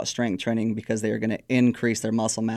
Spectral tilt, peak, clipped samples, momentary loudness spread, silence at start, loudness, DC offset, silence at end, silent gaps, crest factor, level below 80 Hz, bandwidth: -5 dB/octave; -10 dBFS; under 0.1%; 5 LU; 0 s; -25 LUFS; under 0.1%; 0 s; none; 14 dB; -62 dBFS; 13 kHz